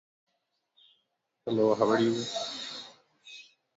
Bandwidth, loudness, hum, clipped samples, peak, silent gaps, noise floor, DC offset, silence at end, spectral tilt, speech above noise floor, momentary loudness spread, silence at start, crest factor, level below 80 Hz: 8 kHz; -29 LUFS; none; under 0.1%; -10 dBFS; none; -79 dBFS; under 0.1%; 0.35 s; -5 dB/octave; 53 dB; 23 LU; 1.45 s; 22 dB; -76 dBFS